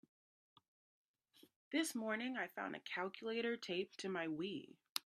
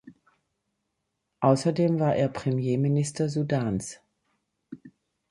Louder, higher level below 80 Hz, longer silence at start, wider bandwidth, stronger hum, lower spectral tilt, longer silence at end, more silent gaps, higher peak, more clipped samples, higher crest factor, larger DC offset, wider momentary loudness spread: second, -43 LUFS vs -26 LUFS; second, under -90 dBFS vs -60 dBFS; first, 1.7 s vs 0.05 s; first, 14.5 kHz vs 11.5 kHz; neither; second, -3.5 dB/octave vs -7 dB/octave; second, 0.05 s vs 0.45 s; first, 4.89-4.95 s vs none; second, -20 dBFS vs -6 dBFS; neither; first, 26 dB vs 20 dB; neither; second, 6 LU vs 17 LU